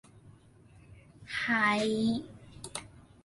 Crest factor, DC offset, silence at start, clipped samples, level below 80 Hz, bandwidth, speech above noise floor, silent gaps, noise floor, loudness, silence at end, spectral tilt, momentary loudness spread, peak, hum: 20 dB; under 0.1%; 0.25 s; under 0.1%; -62 dBFS; 11.5 kHz; 29 dB; none; -58 dBFS; -30 LUFS; 0.25 s; -4 dB/octave; 18 LU; -14 dBFS; none